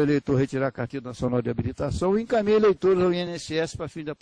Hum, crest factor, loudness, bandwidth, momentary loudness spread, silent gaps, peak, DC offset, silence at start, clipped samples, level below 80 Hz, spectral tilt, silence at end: none; 14 dB; -25 LUFS; 10.5 kHz; 11 LU; none; -10 dBFS; under 0.1%; 0 s; under 0.1%; -46 dBFS; -7 dB/octave; 0.05 s